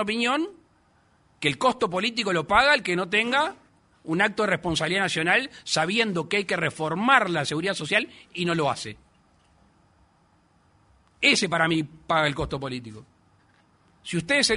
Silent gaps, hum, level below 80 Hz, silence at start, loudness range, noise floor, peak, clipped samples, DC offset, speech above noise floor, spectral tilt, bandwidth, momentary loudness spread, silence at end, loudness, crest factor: none; none; -54 dBFS; 0 s; 5 LU; -62 dBFS; -2 dBFS; under 0.1%; under 0.1%; 38 dB; -3.5 dB/octave; 11 kHz; 11 LU; 0 s; -24 LUFS; 22 dB